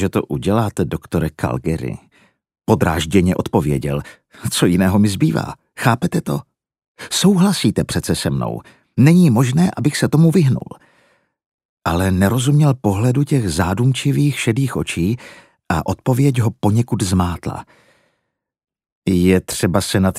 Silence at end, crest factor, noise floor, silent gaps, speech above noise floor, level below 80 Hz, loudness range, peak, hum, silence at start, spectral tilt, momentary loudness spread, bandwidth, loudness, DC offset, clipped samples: 0 s; 16 dB; -74 dBFS; 6.88-6.95 s, 11.46-11.58 s, 11.65-11.77 s, 18.92-19.02 s; 58 dB; -40 dBFS; 4 LU; 0 dBFS; none; 0 s; -6 dB/octave; 12 LU; 15.5 kHz; -17 LUFS; under 0.1%; under 0.1%